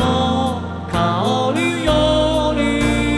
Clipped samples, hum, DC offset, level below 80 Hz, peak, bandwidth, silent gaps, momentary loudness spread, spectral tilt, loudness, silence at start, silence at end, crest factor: under 0.1%; none; under 0.1%; -30 dBFS; -2 dBFS; 11 kHz; none; 5 LU; -5.5 dB/octave; -17 LUFS; 0 s; 0 s; 14 dB